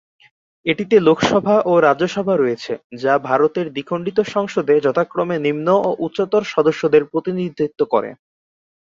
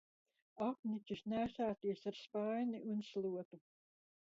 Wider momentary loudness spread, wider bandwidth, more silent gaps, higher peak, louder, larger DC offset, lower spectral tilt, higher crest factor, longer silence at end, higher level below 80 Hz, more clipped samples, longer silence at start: first, 9 LU vs 5 LU; about the same, 7.6 kHz vs 7.4 kHz; about the same, 2.84-2.90 s vs 0.79-0.83 s, 3.45-3.51 s; first, 0 dBFS vs -30 dBFS; first, -18 LUFS vs -43 LUFS; neither; about the same, -6 dB/octave vs -5.5 dB/octave; about the same, 16 dB vs 14 dB; about the same, 0.8 s vs 0.75 s; first, -58 dBFS vs -76 dBFS; neither; about the same, 0.65 s vs 0.55 s